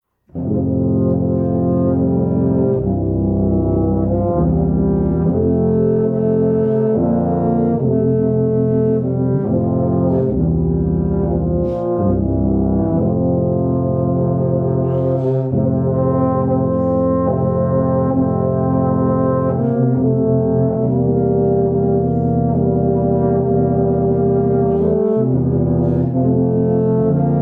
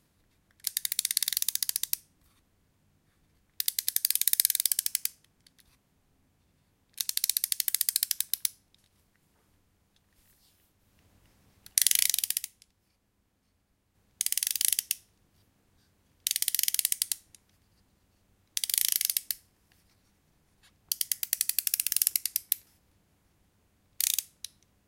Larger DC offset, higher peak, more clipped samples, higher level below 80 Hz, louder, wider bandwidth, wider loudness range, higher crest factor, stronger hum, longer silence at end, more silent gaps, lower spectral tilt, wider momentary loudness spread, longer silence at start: neither; second, -4 dBFS vs 0 dBFS; neither; first, -32 dBFS vs -74 dBFS; first, -16 LUFS vs -28 LUFS; second, 2.2 kHz vs 17 kHz; second, 1 LU vs 4 LU; second, 12 dB vs 34 dB; neither; second, 0 s vs 0.65 s; neither; first, -14 dB/octave vs 4 dB/octave; second, 2 LU vs 11 LU; second, 0.35 s vs 0.65 s